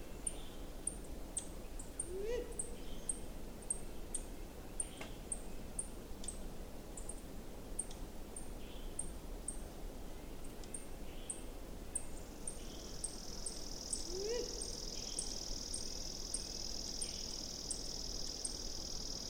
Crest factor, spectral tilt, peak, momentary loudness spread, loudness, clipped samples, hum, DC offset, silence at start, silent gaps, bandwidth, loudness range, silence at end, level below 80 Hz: 20 dB; -2.5 dB/octave; -24 dBFS; 10 LU; -44 LUFS; under 0.1%; none; under 0.1%; 0 s; none; over 20 kHz; 6 LU; 0 s; -50 dBFS